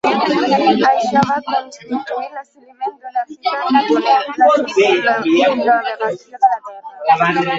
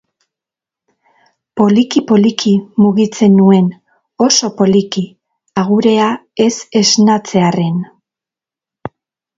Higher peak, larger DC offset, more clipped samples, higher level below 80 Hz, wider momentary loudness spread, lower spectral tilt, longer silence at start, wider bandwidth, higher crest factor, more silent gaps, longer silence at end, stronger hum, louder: about the same, 0 dBFS vs 0 dBFS; neither; neither; second, -62 dBFS vs -56 dBFS; about the same, 12 LU vs 14 LU; about the same, -5 dB/octave vs -5 dB/octave; second, 0.05 s vs 1.55 s; about the same, 7.8 kHz vs 7.8 kHz; about the same, 14 dB vs 14 dB; neither; second, 0 s vs 0.5 s; neither; second, -15 LUFS vs -12 LUFS